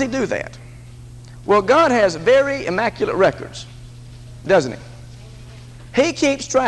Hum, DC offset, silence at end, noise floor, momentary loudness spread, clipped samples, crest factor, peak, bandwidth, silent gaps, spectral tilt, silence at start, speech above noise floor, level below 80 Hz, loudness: none; under 0.1%; 0 s; -38 dBFS; 25 LU; under 0.1%; 16 dB; -2 dBFS; 11.5 kHz; none; -4.5 dB/octave; 0 s; 21 dB; -44 dBFS; -17 LUFS